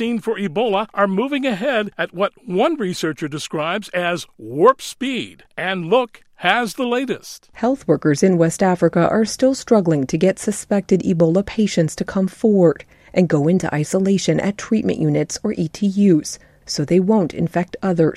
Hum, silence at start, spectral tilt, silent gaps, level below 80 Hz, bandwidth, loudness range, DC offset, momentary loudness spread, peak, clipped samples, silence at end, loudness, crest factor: none; 0 s; -6 dB/octave; none; -52 dBFS; 14.5 kHz; 4 LU; under 0.1%; 8 LU; 0 dBFS; under 0.1%; 0 s; -19 LUFS; 18 dB